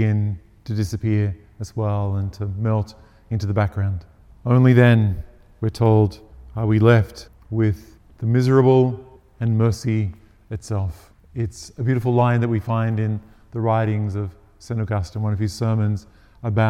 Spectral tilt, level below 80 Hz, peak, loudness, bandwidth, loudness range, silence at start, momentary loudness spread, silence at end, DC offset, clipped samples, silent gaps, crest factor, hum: -8 dB/octave; -46 dBFS; 0 dBFS; -21 LUFS; 11 kHz; 6 LU; 0 s; 16 LU; 0 s; under 0.1%; under 0.1%; none; 20 dB; none